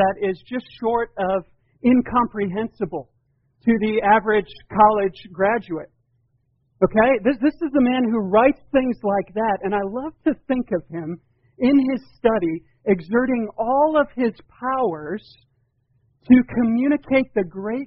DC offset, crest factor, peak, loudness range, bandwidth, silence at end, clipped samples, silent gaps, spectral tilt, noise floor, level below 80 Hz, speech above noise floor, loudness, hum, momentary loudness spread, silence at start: under 0.1%; 18 dB; -2 dBFS; 3 LU; 5.4 kHz; 0 s; under 0.1%; none; -5.5 dB/octave; -66 dBFS; -50 dBFS; 47 dB; -20 LUFS; none; 11 LU; 0 s